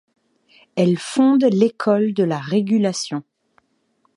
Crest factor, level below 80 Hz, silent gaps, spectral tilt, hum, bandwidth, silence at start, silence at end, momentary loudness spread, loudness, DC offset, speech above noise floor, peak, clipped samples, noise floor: 16 dB; -70 dBFS; none; -6 dB/octave; none; 11 kHz; 0.75 s; 0.95 s; 11 LU; -19 LUFS; under 0.1%; 48 dB; -4 dBFS; under 0.1%; -65 dBFS